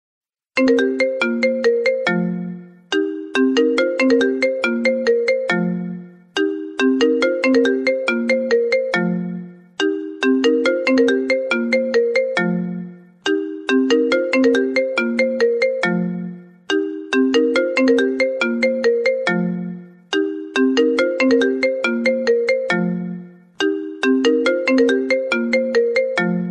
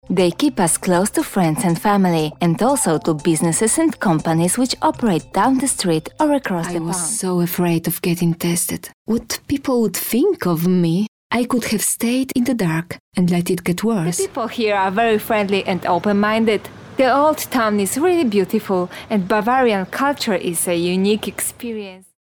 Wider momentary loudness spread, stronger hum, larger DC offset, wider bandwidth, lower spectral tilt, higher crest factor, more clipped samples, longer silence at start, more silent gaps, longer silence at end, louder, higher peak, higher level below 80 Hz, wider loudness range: about the same, 8 LU vs 6 LU; neither; neither; second, 9.8 kHz vs 19.5 kHz; about the same, -5.5 dB/octave vs -5 dB/octave; about the same, 14 dB vs 12 dB; neither; first, 0.55 s vs 0.1 s; second, none vs 8.94-9.05 s, 11.08-11.30 s, 13.00-13.12 s; second, 0 s vs 0.3 s; about the same, -18 LUFS vs -18 LUFS; about the same, -4 dBFS vs -6 dBFS; second, -66 dBFS vs -50 dBFS; about the same, 1 LU vs 2 LU